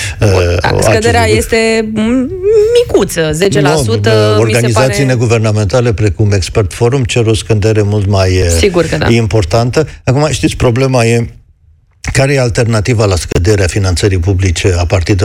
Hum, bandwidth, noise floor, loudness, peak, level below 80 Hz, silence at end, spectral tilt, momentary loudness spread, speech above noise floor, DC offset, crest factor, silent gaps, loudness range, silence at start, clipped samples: none; 15.5 kHz; -47 dBFS; -10 LUFS; 0 dBFS; -26 dBFS; 0 s; -5.5 dB/octave; 3 LU; 37 dB; under 0.1%; 10 dB; none; 2 LU; 0 s; under 0.1%